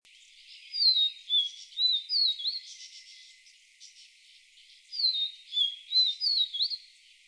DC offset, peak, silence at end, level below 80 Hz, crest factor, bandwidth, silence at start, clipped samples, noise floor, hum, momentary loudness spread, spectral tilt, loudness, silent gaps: under 0.1%; -14 dBFS; 0.5 s; -86 dBFS; 18 dB; 11 kHz; 0.5 s; under 0.1%; -58 dBFS; none; 15 LU; 8 dB/octave; -26 LUFS; none